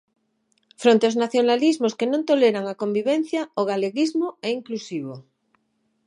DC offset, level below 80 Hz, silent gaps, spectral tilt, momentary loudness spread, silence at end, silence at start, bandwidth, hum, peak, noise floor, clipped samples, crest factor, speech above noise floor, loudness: under 0.1%; -78 dBFS; none; -5 dB/octave; 11 LU; 0.85 s; 0.8 s; 11 kHz; none; -4 dBFS; -70 dBFS; under 0.1%; 20 dB; 49 dB; -22 LUFS